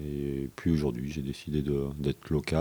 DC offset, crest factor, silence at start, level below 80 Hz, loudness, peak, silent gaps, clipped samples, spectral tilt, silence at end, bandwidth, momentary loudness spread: under 0.1%; 18 dB; 0 s; -44 dBFS; -32 LUFS; -12 dBFS; none; under 0.1%; -7.5 dB/octave; 0 s; over 20 kHz; 6 LU